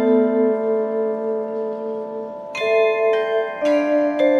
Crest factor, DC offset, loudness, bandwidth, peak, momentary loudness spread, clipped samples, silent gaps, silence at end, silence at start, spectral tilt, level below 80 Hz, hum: 14 dB; under 0.1%; -20 LUFS; 7.2 kHz; -6 dBFS; 10 LU; under 0.1%; none; 0 s; 0 s; -5.5 dB/octave; -68 dBFS; none